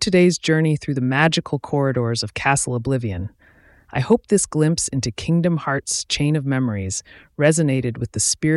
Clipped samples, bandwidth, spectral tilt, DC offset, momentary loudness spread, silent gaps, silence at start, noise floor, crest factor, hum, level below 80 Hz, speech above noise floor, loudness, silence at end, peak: under 0.1%; 12 kHz; -4.5 dB/octave; under 0.1%; 9 LU; none; 0 s; -52 dBFS; 18 dB; none; -48 dBFS; 32 dB; -20 LUFS; 0 s; -2 dBFS